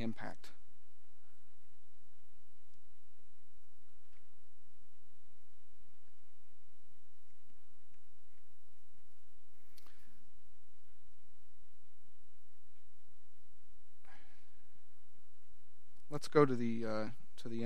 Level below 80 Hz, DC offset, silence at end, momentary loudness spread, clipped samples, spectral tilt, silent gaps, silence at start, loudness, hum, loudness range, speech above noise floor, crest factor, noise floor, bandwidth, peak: -74 dBFS; 2%; 0 s; 20 LU; under 0.1%; -7 dB/octave; none; 0 s; -36 LUFS; 60 Hz at -80 dBFS; 18 LU; 38 dB; 32 dB; -74 dBFS; 15 kHz; -14 dBFS